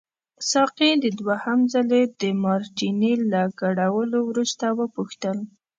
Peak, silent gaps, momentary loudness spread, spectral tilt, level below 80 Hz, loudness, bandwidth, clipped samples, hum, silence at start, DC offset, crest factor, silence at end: -6 dBFS; none; 9 LU; -4.5 dB/octave; -72 dBFS; -22 LUFS; 9.2 kHz; under 0.1%; none; 0.4 s; under 0.1%; 16 dB; 0.3 s